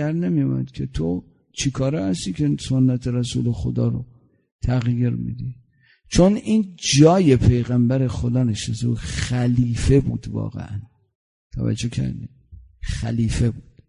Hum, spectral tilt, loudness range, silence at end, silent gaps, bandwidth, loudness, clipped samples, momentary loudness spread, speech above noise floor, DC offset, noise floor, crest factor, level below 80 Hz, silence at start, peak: none; -6.5 dB/octave; 7 LU; 0.25 s; 4.52-4.59 s, 11.15-11.50 s; 11 kHz; -21 LUFS; under 0.1%; 14 LU; 36 dB; under 0.1%; -56 dBFS; 20 dB; -36 dBFS; 0 s; -2 dBFS